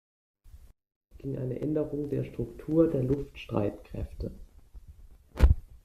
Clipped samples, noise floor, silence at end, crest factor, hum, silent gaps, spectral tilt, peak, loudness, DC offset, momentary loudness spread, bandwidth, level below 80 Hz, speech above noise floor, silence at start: under 0.1%; -52 dBFS; 0.1 s; 24 dB; none; 0.96-1.01 s; -9 dB/octave; -8 dBFS; -31 LUFS; under 0.1%; 15 LU; 13.5 kHz; -36 dBFS; 21 dB; 0.45 s